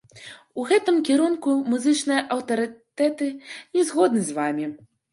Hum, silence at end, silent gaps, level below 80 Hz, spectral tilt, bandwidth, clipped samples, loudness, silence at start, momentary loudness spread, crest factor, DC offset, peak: none; 0.35 s; none; -74 dBFS; -4 dB/octave; 11.5 kHz; under 0.1%; -23 LUFS; 0.15 s; 13 LU; 18 dB; under 0.1%; -6 dBFS